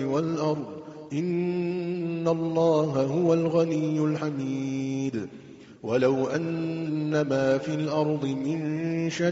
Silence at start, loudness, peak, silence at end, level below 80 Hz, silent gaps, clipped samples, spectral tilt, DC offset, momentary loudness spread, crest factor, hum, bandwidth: 0 s; -27 LUFS; -10 dBFS; 0 s; -66 dBFS; none; under 0.1%; -7 dB/octave; under 0.1%; 8 LU; 16 dB; none; 7.8 kHz